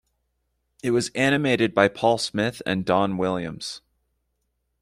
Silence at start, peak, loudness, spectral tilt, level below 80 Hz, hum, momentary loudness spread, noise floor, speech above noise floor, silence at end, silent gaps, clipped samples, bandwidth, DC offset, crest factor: 0.85 s; -4 dBFS; -23 LUFS; -5 dB/octave; -58 dBFS; none; 12 LU; -75 dBFS; 52 dB; 1.05 s; none; under 0.1%; 15 kHz; under 0.1%; 20 dB